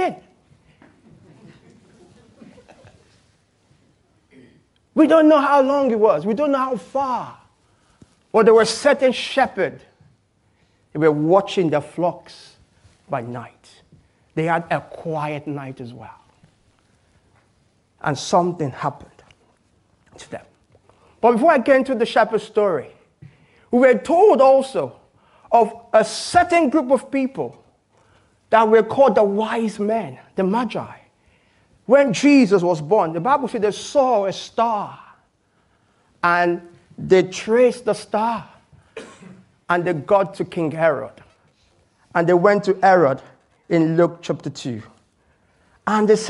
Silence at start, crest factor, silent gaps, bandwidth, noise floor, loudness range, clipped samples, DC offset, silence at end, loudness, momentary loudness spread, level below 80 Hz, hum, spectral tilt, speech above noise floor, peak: 0 s; 20 dB; none; 11.5 kHz; -62 dBFS; 9 LU; under 0.1%; under 0.1%; 0 s; -18 LUFS; 16 LU; -60 dBFS; none; -5.5 dB/octave; 45 dB; 0 dBFS